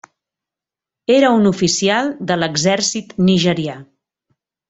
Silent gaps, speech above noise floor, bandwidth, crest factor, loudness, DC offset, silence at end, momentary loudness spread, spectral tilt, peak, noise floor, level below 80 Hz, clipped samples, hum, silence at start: none; 72 dB; 8.4 kHz; 16 dB; -15 LUFS; under 0.1%; 0.85 s; 10 LU; -4.5 dB/octave; -2 dBFS; -87 dBFS; -54 dBFS; under 0.1%; none; 1.1 s